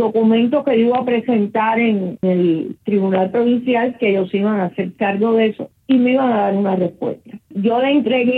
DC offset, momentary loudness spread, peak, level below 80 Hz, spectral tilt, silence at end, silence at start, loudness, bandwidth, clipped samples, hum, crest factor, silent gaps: under 0.1%; 7 LU; -4 dBFS; -64 dBFS; -9.5 dB/octave; 0 s; 0 s; -17 LUFS; 4.4 kHz; under 0.1%; none; 12 dB; none